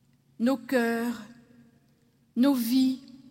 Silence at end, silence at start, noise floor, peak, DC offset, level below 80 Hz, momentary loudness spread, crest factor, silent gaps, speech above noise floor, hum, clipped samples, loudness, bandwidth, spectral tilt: 0.3 s; 0.4 s; -65 dBFS; -14 dBFS; under 0.1%; -76 dBFS; 12 LU; 14 dB; none; 39 dB; none; under 0.1%; -27 LUFS; 16.5 kHz; -4.5 dB/octave